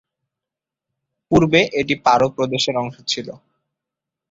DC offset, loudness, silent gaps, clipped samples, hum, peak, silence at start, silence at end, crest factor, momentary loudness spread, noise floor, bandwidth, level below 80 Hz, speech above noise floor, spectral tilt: under 0.1%; -18 LUFS; none; under 0.1%; none; -2 dBFS; 1.3 s; 0.95 s; 20 dB; 9 LU; -86 dBFS; 7.8 kHz; -52 dBFS; 69 dB; -5 dB/octave